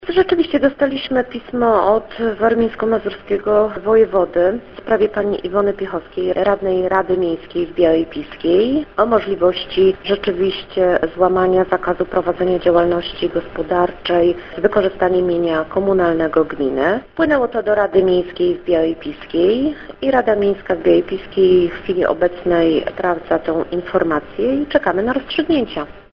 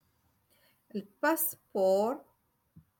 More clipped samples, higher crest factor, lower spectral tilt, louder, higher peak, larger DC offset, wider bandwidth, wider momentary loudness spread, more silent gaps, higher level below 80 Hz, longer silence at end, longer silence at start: neither; about the same, 16 dB vs 18 dB; first, -8.5 dB/octave vs -4 dB/octave; first, -17 LUFS vs -30 LUFS; first, 0 dBFS vs -16 dBFS; neither; second, 5.6 kHz vs 17.5 kHz; second, 6 LU vs 15 LU; neither; first, -42 dBFS vs -78 dBFS; second, 0.1 s vs 0.8 s; second, 0 s vs 0.95 s